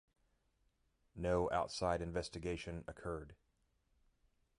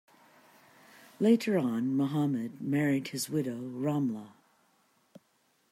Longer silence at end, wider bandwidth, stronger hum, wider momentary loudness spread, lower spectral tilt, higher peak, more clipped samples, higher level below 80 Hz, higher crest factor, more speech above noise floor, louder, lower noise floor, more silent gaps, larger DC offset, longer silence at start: second, 1.25 s vs 1.45 s; second, 11 kHz vs 16 kHz; neither; first, 12 LU vs 8 LU; about the same, -5.5 dB/octave vs -6 dB/octave; second, -22 dBFS vs -14 dBFS; neither; first, -58 dBFS vs -78 dBFS; about the same, 22 dB vs 20 dB; about the same, 39 dB vs 42 dB; second, -41 LUFS vs -30 LUFS; first, -79 dBFS vs -71 dBFS; neither; neither; about the same, 1.15 s vs 1.2 s